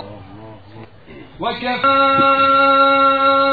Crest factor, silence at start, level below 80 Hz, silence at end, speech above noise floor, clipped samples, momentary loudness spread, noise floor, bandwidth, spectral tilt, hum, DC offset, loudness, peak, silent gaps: 14 dB; 0 s; -54 dBFS; 0 s; 26 dB; under 0.1%; 11 LU; -40 dBFS; 4.8 kHz; -7 dB/octave; none; 0.4%; -13 LUFS; -2 dBFS; none